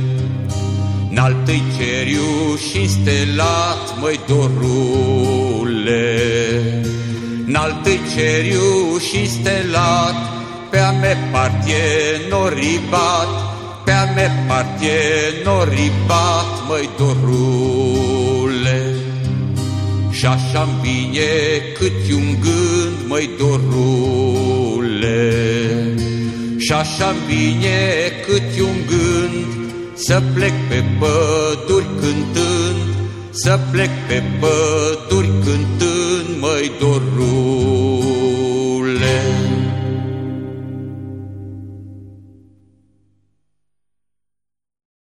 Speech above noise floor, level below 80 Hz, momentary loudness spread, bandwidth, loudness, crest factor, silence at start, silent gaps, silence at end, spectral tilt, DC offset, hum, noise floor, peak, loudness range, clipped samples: 66 dB; -40 dBFS; 6 LU; 12.5 kHz; -16 LUFS; 16 dB; 0 s; none; 2.95 s; -5.5 dB/octave; under 0.1%; 50 Hz at -40 dBFS; -82 dBFS; 0 dBFS; 2 LU; under 0.1%